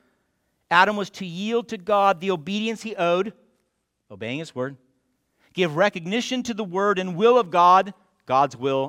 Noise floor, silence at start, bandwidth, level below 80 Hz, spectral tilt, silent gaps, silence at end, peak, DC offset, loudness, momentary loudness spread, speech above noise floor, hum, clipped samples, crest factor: -74 dBFS; 0.7 s; 15 kHz; -70 dBFS; -5 dB/octave; none; 0 s; -2 dBFS; under 0.1%; -22 LUFS; 14 LU; 52 dB; none; under 0.1%; 20 dB